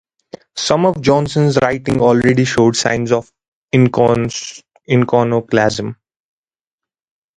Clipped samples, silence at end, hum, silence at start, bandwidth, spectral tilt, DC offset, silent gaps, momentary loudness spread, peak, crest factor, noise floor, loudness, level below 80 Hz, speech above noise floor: under 0.1%; 1.45 s; none; 0.55 s; 11 kHz; -5.5 dB/octave; under 0.1%; 3.48-3.68 s; 9 LU; 0 dBFS; 16 dB; -87 dBFS; -14 LUFS; -46 dBFS; 74 dB